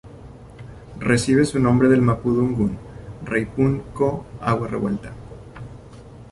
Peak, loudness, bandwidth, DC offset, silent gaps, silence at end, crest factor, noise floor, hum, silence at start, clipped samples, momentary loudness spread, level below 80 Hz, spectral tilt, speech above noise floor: -4 dBFS; -20 LUFS; 11.5 kHz; under 0.1%; none; 0 s; 18 dB; -41 dBFS; none; 0.05 s; under 0.1%; 23 LU; -44 dBFS; -7 dB/octave; 22 dB